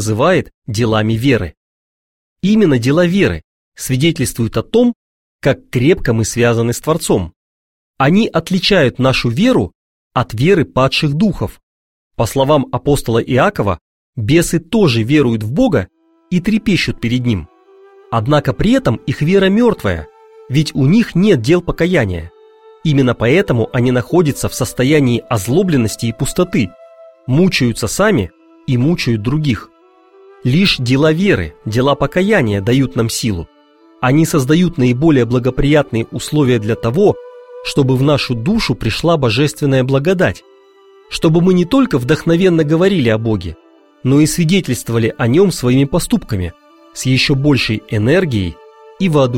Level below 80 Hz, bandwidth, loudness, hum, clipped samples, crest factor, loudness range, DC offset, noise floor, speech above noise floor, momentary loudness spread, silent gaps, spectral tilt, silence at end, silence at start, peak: -36 dBFS; 16.5 kHz; -14 LUFS; none; under 0.1%; 14 dB; 2 LU; 0.4%; -46 dBFS; 33 dB; 8 LU; 0.54-0.62 s, 1.57-2.36 s, 3.44-3.72 s, 4.95-5.39 s, 7.36-7.94 s, 9.75-10.10 s, 11.63-12.11 s, 13.81-14.13 s; -6 dB/octave; 0 s; 0 s; 0 dBFS